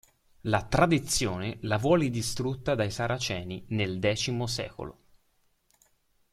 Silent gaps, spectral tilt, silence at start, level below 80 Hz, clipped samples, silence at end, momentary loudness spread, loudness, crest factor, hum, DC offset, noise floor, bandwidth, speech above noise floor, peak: none; -4.5 dB/octave; 0.45 s; -50 dBFS; under 0.1%; 1.4 s; 10 LU; -29 LUFS; 22 dB; none; under 0.1%; -70 dBFS; 15 kHz; 42 dB; -8 dBFS